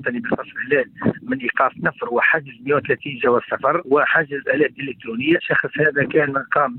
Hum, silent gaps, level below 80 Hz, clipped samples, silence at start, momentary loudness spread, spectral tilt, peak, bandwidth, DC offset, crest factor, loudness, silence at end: none; none; -60 dBFS; under 0.1%; 0 s; 7 LU; -9 dB/octave; -6 dBFS; 4.2 kHz; under 0.1%; 14 dB; -19 LUFS; 0 s